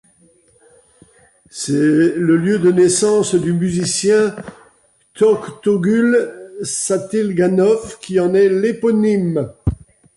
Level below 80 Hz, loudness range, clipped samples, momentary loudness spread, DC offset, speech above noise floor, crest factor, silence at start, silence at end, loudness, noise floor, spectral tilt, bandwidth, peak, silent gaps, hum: -40 dBFS; 2 LU; under 0.1%; 10 LU; under 0.1%; 40 dB; 12 dB; 1.55 s; 0.4 s; -16 LUFS; -55 dBFS; -5.5 dB/octave; 11.5 kHz; -4 dBFS; none; none